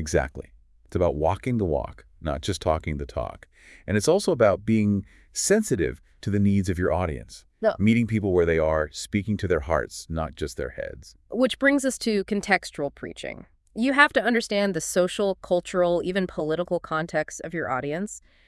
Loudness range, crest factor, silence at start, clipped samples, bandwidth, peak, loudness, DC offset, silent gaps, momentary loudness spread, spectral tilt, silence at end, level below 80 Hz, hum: 4 LU; 22 dB; 0 s; under 0.1%; 12 kHz; -4 dBFS; -25 LUFS; under 0.1%; none; 13 LU; -5 dB/octave; 0.3 s; -44 dBFS; none